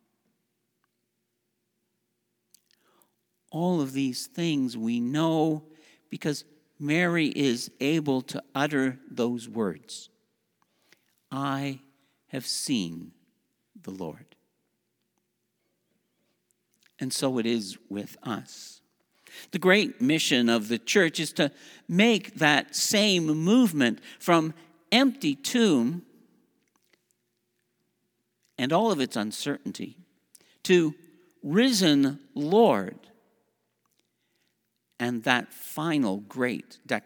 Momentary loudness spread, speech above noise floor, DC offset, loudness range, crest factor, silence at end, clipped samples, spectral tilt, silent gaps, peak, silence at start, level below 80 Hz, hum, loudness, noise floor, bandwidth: 17 LU; 53 dB; under 0.1%; 12 LU; 24 dB; 0.05 s; under 0.1%; -4.5 dB/octave; none; -4 dBFS; 3.55 s; -80 dBFS; none; -26 LUFS; -79 dBFS; over 20 kHz